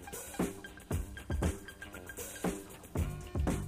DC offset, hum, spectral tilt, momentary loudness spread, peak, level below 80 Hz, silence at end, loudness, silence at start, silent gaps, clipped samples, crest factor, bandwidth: under 0.1%; none; -5.5 dB/octave; 10 LU; -20 dBFS; -44 dBFS; 0 s; -39 LUFS; 0 s; none; under 0.1%; 18 dB; 15.5 kHz